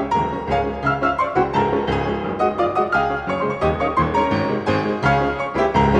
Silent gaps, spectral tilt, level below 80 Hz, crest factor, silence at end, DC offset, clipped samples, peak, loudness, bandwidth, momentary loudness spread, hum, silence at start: none; -7 dB/octave; -36 dBFS; 16 dB; 0 s; under 0.1%; under 0.1%; -4 dBFS; -20 LUFS; 9.6 kHz; 3 LU; none; 0 s